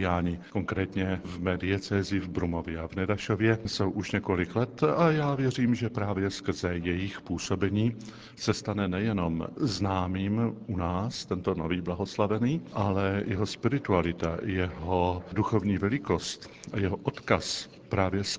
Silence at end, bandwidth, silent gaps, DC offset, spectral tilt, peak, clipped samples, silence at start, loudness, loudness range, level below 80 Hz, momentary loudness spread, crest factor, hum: 0 s; 8 kHz; none; under 0.1%; -6 dB/octave; -6 dBFS; under 0.1%; 0 s; -29 LUFS; 3 LU; -46 dBFS; 6 LU; 22 dB; none